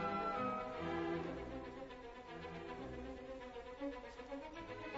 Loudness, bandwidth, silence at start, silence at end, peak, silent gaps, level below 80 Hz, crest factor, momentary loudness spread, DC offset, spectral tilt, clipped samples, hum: -46 LUFS; 7.6 kHz; 0 s; 0 s; -30 dBFS; none; -62 dBFS; 16 dB; 11 LU; under 0.1%; -4.5 dB/octave; under 0.1%; none